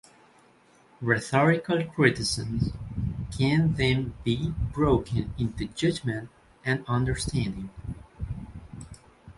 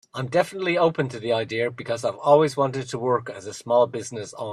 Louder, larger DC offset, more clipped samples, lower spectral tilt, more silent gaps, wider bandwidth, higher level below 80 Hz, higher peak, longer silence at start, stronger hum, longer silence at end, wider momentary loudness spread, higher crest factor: second, -27 LUFS vs -23 LUFS; neither; neither; about the same, -6 dB/octave vs -5.5 dB/octave; neither; second, 11.5 kHz vs 13 kHz; first, -42 dBFS vs -66 dBFS; about the same, -4 dBFS vs -4 dBFS; first, 1 s vs 0.15 s; neither; about the same, 0.05 s vs 0 s; first, 17 LU vs 13 LU; about the same, 24 dB vs 20 dB